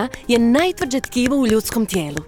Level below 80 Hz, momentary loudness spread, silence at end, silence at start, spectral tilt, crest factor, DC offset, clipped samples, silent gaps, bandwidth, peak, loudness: -42 dBFS; 6 LU; 0 s; 0 s; -4.5 dB/octave; 16 dB; under 0.1%; under 0.1%; none; 19 kHz; -2 dBFS; -18 LUFS